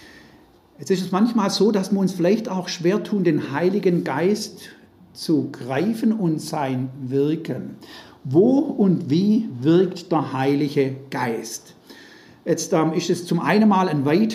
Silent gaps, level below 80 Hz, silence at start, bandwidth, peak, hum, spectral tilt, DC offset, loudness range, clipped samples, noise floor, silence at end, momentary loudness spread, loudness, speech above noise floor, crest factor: none; -68 dBFS; 0.8 s; 15 kHz; -4 dBFS; none; -6 dB/octave; under 0.1%; 4 LU; under 0.1%; -52 dBFS; 0 s; 12 LU; -21 LUFS; 31 dB; 16 dB